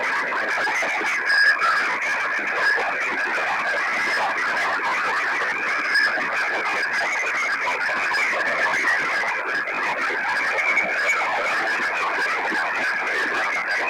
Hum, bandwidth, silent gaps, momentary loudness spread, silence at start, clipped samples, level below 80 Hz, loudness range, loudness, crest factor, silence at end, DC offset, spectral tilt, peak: none; 18 kHz; none; 3 LU; 0 s; under 0.1%; -68 dBFS; 1 LU; -21 LUFS; 12 dB; 0 s; under 0.1%; -1 dB/octave; -10 dBFS